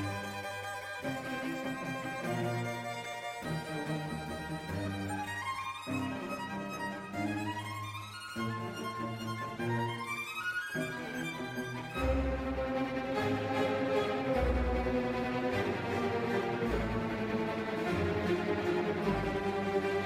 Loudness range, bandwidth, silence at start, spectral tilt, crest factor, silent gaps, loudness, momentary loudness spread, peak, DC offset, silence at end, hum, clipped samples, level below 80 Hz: 5 LU; 16 kHz; 0 s; -6 dB/octave; 16 dB; none; -35 LUFS; 7 LU; -18 dBFS; under 0.1%; 0 s; none; under 0.1%; -46 dBFS